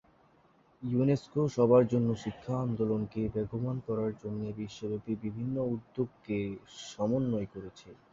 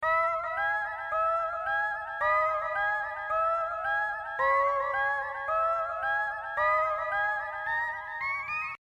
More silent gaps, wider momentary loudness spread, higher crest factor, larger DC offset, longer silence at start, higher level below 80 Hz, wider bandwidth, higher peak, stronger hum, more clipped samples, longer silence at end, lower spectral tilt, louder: neither; first, 12 LU vs 6 LU; first, 20 dB vs 14 dB; neither; first, 0.8 s vs 0 s; about the same, -60 dBFS vs -60 dBFS; second, 7.8 kHz vs 11.5 kHz; about the same, -12 dBFS vs -14 dBFS; neither; neither; first, 0.2 s vs 0.05 s; first, -8 dB/octave vs -3 dB/octave; second, -32 LUFS vs -29 LUFS